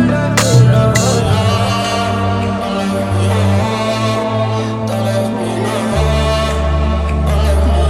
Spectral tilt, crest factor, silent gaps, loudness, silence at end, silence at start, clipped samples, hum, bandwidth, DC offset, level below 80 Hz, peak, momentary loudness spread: -5.5 dB/octave; 14 dB; none; -14 LUFS; 0 s; 0 s; under 0.1%; none; 15.5 kHz; under 0.1%; -20 dBFS; 0 dBFS; 6 LU